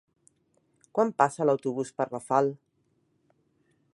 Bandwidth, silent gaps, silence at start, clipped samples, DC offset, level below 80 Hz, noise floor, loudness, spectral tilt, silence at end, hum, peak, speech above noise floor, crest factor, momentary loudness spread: 11.5 kHz; none; 0.95 s; under 0.1%; under 0.1%; -78 dBFS; -72 dBFS; -27 LUFS; -6.5 dB/octave; 1.4 s; none; -6 dBFS; 45 dB; 24 dB; 9 LU